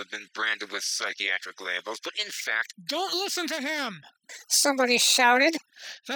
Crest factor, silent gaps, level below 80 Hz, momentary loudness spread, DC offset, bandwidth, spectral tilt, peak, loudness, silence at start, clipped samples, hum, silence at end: 20 dB; none; under -90 dBFS; 16 LU; under 0.1%; 19 kHz; 0 dB/octave; -8 dBFS; -25 LUFS; 0 s; under 0.1%; none; 0 s